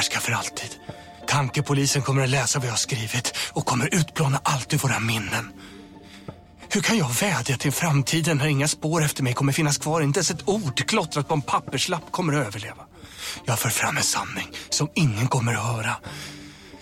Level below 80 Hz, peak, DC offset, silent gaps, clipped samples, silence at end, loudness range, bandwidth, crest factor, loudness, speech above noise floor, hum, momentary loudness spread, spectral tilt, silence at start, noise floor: -54 dBFS; -8 dBFS; under 0.1%; none; under 0.1%; 0 s; 3 LU; 16.5 kHz; 16 dB; -23 LUFS; 20 dB; none; 15 LU; -4 dB/octave; 0 s; -44 dBFS